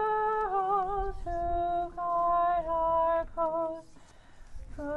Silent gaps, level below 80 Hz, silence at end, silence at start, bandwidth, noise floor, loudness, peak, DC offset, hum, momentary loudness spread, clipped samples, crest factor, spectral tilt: none; -44 dBFS; 0 s; 0 s; 8.4 kHz; -52 dBFS; -30 LUFS; -18 dBFS; under 0.1%; none; 9 LU; under 0.1%; 12 dB; -7 dB/octave